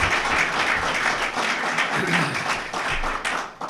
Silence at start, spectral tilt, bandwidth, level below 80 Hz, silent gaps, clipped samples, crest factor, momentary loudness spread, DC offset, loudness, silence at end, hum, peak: 0 s; -3 dB/octave; 13.5 kHz; -40 dBFS; none; under 0.1%; 16 dB; 5 LU; under 0.1%; -22 LUFS; 0 s; none; -8 dBFS